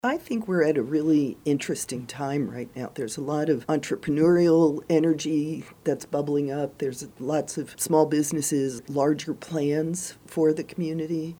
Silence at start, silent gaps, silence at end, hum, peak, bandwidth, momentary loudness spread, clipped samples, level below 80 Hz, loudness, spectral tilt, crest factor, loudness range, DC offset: 0.05 s; none; 0.05 s; none; -6 dBFS; 17.5 kHz; 10 LU; under 0.1%; -62 dBFS; -26 LUFS; -5.5 dB/octave; 18 dB; 3 LU; under 0.1%